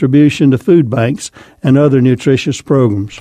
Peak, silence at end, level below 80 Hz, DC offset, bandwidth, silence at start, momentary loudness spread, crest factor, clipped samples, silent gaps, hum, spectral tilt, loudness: 0 dBFS; 0 s; -46 dBFS; under 0.1%; 11.5 kHz; 0 s; 8 LU; 10 dB; under 0.1%; none; none; -7 dB/octave; -11 LUFS